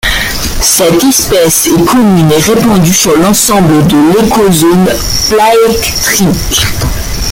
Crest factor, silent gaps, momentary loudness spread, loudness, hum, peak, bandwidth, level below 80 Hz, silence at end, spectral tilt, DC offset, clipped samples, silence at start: 6 dB; none; 4 LU; -7 LUFS; none; 0 dBFS; over 20 kHz; -22 dBFS; 0 s; -4 dB/octave; under 0.1%; 0.2%; 0.05 s